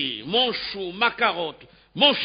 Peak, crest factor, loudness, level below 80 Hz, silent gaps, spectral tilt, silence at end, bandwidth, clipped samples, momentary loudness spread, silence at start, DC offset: -4 dBFS; 20 dB; -23 LUFS; -60 dBFS; none; -8 dB/octave; 0 s; 5.2 kHz; under 0.1%; 12 LU; 0 s; under 0.1%